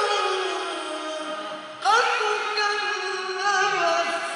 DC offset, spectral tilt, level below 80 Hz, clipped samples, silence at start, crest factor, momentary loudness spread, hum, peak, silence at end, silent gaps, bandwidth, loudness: under 0.1%; -0.5 dB/octave; -84 dBFS; under 0.1%; 0 s; 16 dB; 10 LU; none; -8 dBFS; 0 s; none; 11 kHz; -24 LUFS